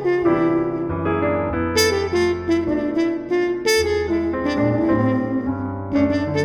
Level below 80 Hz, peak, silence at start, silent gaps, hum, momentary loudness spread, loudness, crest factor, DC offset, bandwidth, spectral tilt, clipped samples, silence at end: -42 dBFS; -4 dBFS; 0 s; none; none; 5 LU; -20 LUFS; 14 dB; under 0.1%; 17.5 kHz; -5.5 dB/octave; under 0.1%; 0 s